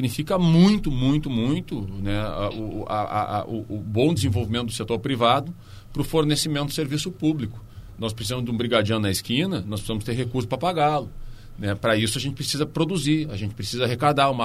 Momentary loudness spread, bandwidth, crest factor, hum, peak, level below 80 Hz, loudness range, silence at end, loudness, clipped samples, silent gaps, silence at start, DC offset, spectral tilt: 10 LU; 15 kHz; 18 dB; none; -6 dBFS; -40 dBFS; 2 LU; 0 s; -24 LUFS; under 0.1%; none; 0 s; under 0.1%; -5.5 dB/octave